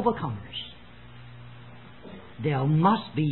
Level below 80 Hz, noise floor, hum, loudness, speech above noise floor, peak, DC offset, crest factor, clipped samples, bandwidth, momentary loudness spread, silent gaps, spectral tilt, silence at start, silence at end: -56 dBFS; -48 dBFS; 60 Hz at -50 dBFS; -26 LUFS; 23 dB; -8 dBFS; 0.3%; 20 dB; under 0.1%; 4.2 kHz; 25 LU; none; -11.5 dB/octave; 0 s; 0 s